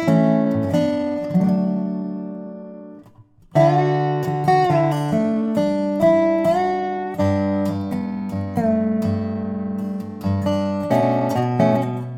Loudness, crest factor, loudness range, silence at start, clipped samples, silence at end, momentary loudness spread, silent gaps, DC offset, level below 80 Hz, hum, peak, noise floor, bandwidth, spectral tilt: -20 LUFS; 18 dB; 4 LU; 0 s; under 0.1%; 0 s; 10 LU; none; under 0.1%; -54 dBFS; none; -2 dBFS; -49 dBFS; 16 kHz; -8.5 dB/octave